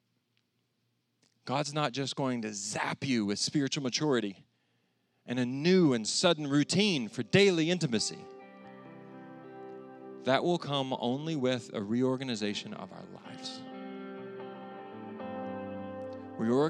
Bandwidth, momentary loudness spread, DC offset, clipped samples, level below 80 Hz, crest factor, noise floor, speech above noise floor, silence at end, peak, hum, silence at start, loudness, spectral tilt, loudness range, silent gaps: 11.5 kHz; 21 LU; under 0.1%; under 0.1%; -84 dBFS; 24 dB; -77 dBFS; 48 dB; 0 s; -8 dBFS; none; 1.45 s; -31 LUFS; -4.5 dB/octave; 12 LU; none